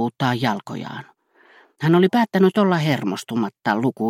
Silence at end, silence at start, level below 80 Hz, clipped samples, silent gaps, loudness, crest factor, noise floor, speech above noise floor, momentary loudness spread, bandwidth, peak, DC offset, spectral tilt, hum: 0 s; 0 s; -66 dBFS; under 0.1%; none; -20 LUFS; 18 dB; -53 dBFS; 34 dB; 15 LU; 15.5 kHz; -4 dBFS; under 0.1%; -7 dB/octave; none